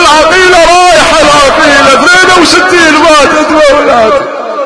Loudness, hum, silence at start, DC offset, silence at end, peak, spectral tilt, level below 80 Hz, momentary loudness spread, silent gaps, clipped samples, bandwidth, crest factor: -3 LUFS; none; 0 s; under 0.1%; 0 s; 0 dBFS; -2 dB/octave; -28 dBFS; 3 LU; none; 10%; 11 kHz; 4 dB